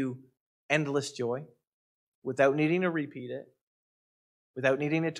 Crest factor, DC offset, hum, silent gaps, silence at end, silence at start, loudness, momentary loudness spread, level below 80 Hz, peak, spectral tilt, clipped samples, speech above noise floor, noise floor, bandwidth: 20 dB; under 0.1%; none; 0.40-0.69 s, 1.67-2.22 s, 3.61-4.54 s; 0 s; 0 s; -30 LUFS; 16 LU; -80 dBFS; -12 dBFS; -6 dB/octave; under 0.1%; over 61 dB; under -90 dBFS; 12 kHz